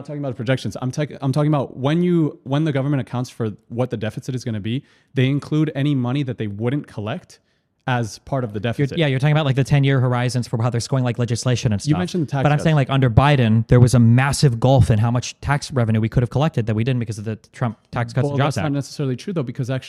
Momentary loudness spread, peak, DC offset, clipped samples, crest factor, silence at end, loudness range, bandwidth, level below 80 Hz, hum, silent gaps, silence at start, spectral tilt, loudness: 11 LU; 0 dBFS; under 0.1%; under 0.1%; 18 dB; 0 s; 7 LU; 12 kHz; -42 dBFS; none; none; 0 s; -6.5 dB/octave; -20 LUFS